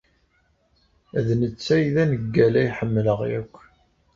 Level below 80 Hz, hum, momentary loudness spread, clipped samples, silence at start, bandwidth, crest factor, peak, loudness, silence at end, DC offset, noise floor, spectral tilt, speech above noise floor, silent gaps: -52 dBFS; none; 10 LU; under 0.1%; 1.15 s; 7.6 kHz; 18 dB; -4 dBFS; -22 LUFS; 0.7 s; under 0.1%; -65 dBFS; -8 dB/octave; 44 dB; none